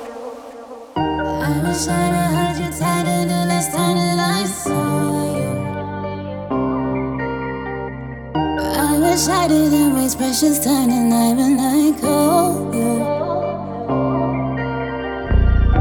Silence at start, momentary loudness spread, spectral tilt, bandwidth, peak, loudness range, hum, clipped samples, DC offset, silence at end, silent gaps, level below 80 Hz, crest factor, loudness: 0 s; 11 LU; -5 dB/octave; over 20 kHz; -4 dBFS; 6 LU; none; under 0.1%; under 0.1%; 0 s; none; -28 dBFS; 14 dB; -18 LUFS